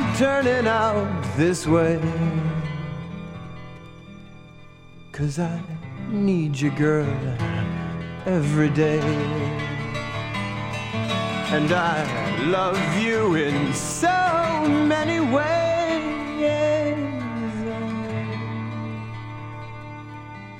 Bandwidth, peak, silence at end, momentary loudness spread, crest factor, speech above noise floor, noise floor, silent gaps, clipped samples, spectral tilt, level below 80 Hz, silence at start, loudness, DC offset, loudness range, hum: 16 kHz; -6 dBFS; 0 s; 15 LU; 18 dB; 23 dB; -44 dBFS; none; under 0.1%; -6 dB/octave; -48 dBFS; 0 s; -23 LUFS; under 0.1%; 9 LU; none